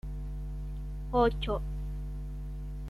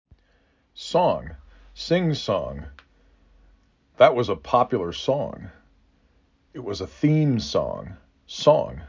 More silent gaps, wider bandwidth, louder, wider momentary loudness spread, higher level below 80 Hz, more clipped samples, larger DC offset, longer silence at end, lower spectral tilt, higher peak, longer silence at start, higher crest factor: neither; second, 5.4 kHz vs 7.6 kHz; second, -34 LUFS vs -23 LUFS; second, 13 LU vs 21 LU; first, -36 dBFS vs -48 dBFS; neither; neither; about the same, 0 s vs 0 s; about the same, -7.5 dB/octave vs -6.5 dB/octave; second, -14 dBFS vs -2 dBFS; second, 0.05 s vs 0.75 s; about the same, 18 dB vs 22 dB